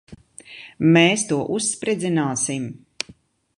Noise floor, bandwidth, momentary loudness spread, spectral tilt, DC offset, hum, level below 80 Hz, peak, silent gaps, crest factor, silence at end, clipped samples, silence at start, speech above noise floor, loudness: -51 dBFS; 11.5 kHz; 20 LU; -4 dB/octave; under 0.1%; none; -60 dBFS; -2 dBFS; none; 20 dB; 0.85 s; under 0.1%; 0.1 s; 31 dB; -20 LUFS